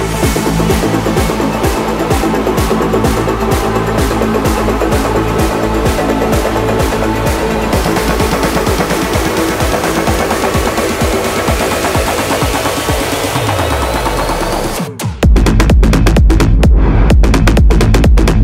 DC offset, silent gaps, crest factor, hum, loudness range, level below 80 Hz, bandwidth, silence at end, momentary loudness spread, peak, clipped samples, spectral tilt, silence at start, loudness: under 0.1%; none; 10 dB; none; 3 LU; -16 dBFS; 16.5 kHz; 0 s; 4 LU; 0 dBFS; under 0.1%; -5.5 dB/octave; 0 s; -12 LUFS